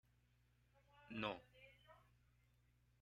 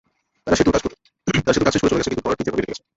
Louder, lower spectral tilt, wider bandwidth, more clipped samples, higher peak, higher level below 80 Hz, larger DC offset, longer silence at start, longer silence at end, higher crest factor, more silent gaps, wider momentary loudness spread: second, -50 LUFS vs -20 LUFS; about the same, -6 dB/octave vs -5 dB/octave; first, 9.6 kHz vs 8 kHz; neither; second, -30 dBFS vs -2 dBFS; second, -78 dBFS vs -40 dBFS; neither; first, 0.95 s vs 0.45 s; first, 1.05 s vs 0.2 s; first, 28 dB vs 18 dB; neither; first, 21 LU vs 11 LU